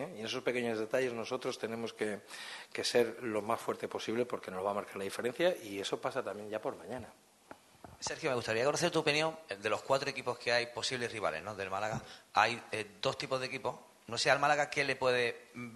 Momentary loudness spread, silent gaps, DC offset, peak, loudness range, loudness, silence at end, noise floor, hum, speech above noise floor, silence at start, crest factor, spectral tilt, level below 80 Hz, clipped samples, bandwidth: 11 LU; none; under 0.1%; -12 dBFS; 4 LU; -35 LUFS; 0 s; -58 dBFS; none; 22 dB; 0 s; 24 dB; -3.5 dB/octave; -74 dBFS; under 0.1%; 12.5 kHz